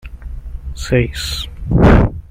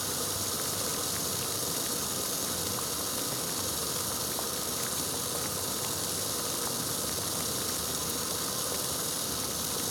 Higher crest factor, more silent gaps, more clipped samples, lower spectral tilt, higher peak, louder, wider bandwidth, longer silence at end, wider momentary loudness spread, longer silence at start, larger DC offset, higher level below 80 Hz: about the same, 14 dB vs 18 dB; neither; neither; first, -6.5 dB/octave vs -1.5 dB/octave; first, -2 dBFS vs -16 dBFS; first, -15 LUFS vs -30 LUFS; second, 16 kHz vs over 20 kHz; about the same, 0.1 s vs 0 s; first, 21 LU vs 1 LU; about the same, 0.05 s vs 0 s; neither; first, -20 dBFS vs -58 dBFS